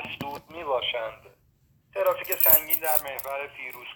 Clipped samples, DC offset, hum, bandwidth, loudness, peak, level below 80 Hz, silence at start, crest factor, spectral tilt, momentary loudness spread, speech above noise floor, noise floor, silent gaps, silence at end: under 0.1%; under 0.1%; none; over 20 kHz; -23 LUFS; 0 dBFS; -58 dBFS; 0 s; 26 dB; -1.5 dB/octave; 20 LU; 38 dB; -64 dBFS; none; 0 s